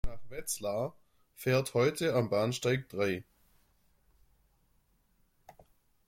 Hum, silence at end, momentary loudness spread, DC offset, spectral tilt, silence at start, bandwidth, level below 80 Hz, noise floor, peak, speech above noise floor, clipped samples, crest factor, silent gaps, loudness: none; 2.85 s; 11 LU; under 0.1%; -5 dB/octave; 0.05 s; 16.5 kHz; -52 dBFS; -71 dBFS; -16 dBFS; 39 dB; under 0.1%; 20 dB; none; -32 LUFS